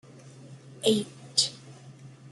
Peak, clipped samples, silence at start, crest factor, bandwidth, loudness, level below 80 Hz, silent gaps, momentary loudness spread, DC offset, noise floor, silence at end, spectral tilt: -6 dBFS; under 0.1%; 0.25 s; 26 dB; 12 kHz; -27 LUFS; -74 dBFS; none; 23 LU; under 0.1%; -49 dBFS; 0 s; -3 dB/octave